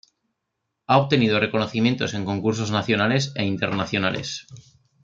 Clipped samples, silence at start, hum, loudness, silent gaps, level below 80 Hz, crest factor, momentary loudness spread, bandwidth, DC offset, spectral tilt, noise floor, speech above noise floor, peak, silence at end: under 0.1%; 0.9 s; none; -22 LUFS; none; -60 dBFS; 20 dB; 7 LU; 7.8 kHz; under 0.1%; -5.5 dB/octave; -79 dBFS; 57 dB; -2 dBFS; 0.45 s